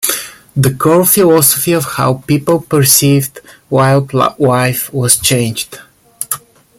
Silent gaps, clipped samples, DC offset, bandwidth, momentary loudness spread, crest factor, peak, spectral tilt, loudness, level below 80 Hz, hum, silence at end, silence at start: none; under 0.1%; under 0.1%; over 20 kHz; 13 LU; 12 dB; 0 dBFS; -4.5 dB/octave; -11 LUFS; -46 dBFS; none; 0.4 s; 0 s